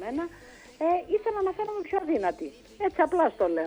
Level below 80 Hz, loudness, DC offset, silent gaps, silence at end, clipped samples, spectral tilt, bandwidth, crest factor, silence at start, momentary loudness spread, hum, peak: -58 dBFS; -28 LUFS; under 0.1%; none; 0 s; under 0.1%; -6 dB/octave; over 20 kHz; 18 dB; 0 s; 10 LU; none; -10 dBFS